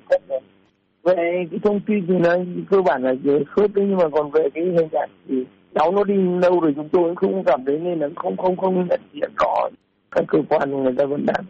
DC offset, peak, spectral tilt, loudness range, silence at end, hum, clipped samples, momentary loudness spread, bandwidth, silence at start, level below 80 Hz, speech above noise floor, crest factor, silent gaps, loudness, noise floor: under 0.1%; -8 dBFS; -6.5 dB/octave; 2 LU; 0 s; none; under 0.1%; 7 LU; 7.4 kHz; 0.1 s; -58 dBFS; 41 dB; 12 dB; none; -20 LUFS; -60 dBFS